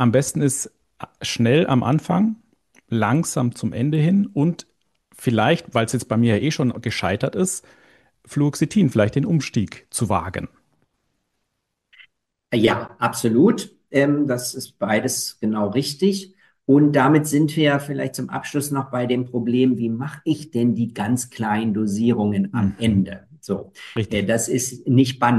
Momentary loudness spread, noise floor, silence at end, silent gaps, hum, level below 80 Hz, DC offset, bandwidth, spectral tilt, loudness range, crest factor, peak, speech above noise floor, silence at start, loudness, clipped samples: 10 LU; -76 dBFS; 0 s; none; none; -56 dBFS; under 0.1%; 12.5 kHz; -5.5 dB/octave; 3 LU; 18 dB; -4 dBFS; 56 dB; 0 s; -21 LUFS; under 0.1%